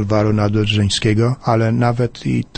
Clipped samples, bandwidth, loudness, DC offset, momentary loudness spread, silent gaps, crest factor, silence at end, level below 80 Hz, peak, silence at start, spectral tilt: under 0.1%; 8.8 kHz; -16 LUFS; under 0.1%; 4 LU; none; 14 dB; 0.15 s; -38 dBFS; -2 dBFS; 0 s; -6 dB/octave